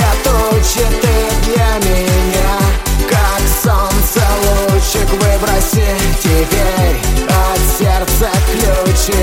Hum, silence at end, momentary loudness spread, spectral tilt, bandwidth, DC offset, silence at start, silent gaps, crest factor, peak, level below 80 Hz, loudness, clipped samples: none; 0 s; 2 LU; -4.5 dB/octave; 17 kHz; under 0.1%; 0 s; none; 10 dB; 0 dBFS; -14 dBFS; -13 LUFS; under 0.1%